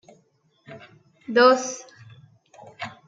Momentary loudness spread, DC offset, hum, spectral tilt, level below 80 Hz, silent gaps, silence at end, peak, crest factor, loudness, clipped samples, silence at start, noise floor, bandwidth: 28 LU; under 0.1%; none; -3 dB/octave; -80 dBFS; none; 0.2 s; -4 dBFS; 22 dB; -19 LUFS; under 0.1%; 0.7 s; -64 dBFS; 7.8 kHz